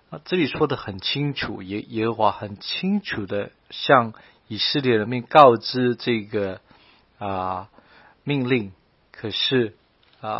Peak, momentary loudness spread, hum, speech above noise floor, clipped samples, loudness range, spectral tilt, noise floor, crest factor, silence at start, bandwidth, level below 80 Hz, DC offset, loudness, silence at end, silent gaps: 0 dBFS; 14 LU; none; 33 dB; under 0.1%; 7 LU; -8 dB/octave; -55 dBFS; 22 dB; 0.1 s; 6 kHz; -58 dBFS; under 0.1%; -22 LUFS; 0 s; none